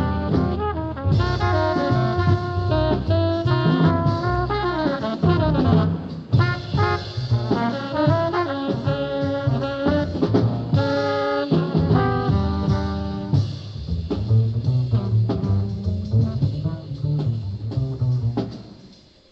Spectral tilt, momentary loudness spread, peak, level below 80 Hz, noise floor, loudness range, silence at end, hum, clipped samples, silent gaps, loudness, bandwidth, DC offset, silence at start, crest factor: -8.5 dB/octave; 7 LU; -4 dBFS; -38 dBFS; -48 dBFS; 3 LU; 0.35 s; none; under 0.1%; none; -22 LUFS; 7 kHz; under 0.1%; 0 s; 16 dB